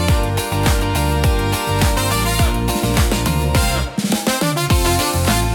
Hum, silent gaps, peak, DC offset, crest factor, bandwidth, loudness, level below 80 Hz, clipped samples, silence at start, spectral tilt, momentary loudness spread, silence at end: none; none; -2 dBFS; under 0.1%; 14 dB; 18 kHz; -17 LUFS; -22 dBFS; under 0.1%; 0 s; -4.5 dB/octave; 2 LU; 0 s